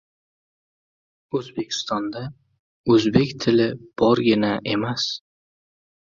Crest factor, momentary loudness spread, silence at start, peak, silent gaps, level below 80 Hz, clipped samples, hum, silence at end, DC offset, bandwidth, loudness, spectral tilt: 22 dB; 13 LU; 1.35 s; -2 dBFS; 2.59-2.84 s; -56 dBFS; under 0.1%; none; 0.95 s; under 0.1%; 7.6 kHz; -22 LUFS; -5.5 dB/octave